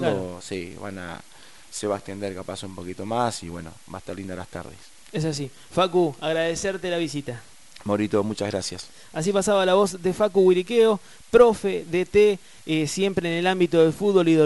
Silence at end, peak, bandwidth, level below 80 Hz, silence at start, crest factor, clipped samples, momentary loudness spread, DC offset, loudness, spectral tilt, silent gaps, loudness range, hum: 0 s; -2 dBFS; 11.5 kHz; -54 dBFS; 0 s; 20 dB; under 0.1%; 18 LU; 0.4%; -23 LUFS; -5 dB/octave; none; 11 LU; none